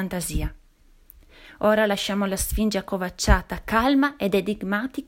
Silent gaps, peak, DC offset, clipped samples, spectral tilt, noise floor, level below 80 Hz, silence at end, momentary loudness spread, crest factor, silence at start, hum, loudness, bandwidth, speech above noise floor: none; -2 dBFS; under 0.1%; under 0.1%; -4.5 dB/octave; -55 dBFS; -32 dBFS; 0.05 s; 8 LU; 22 dB; 0 s; none; -23 LUFS; 16.5 kHz; 32 dB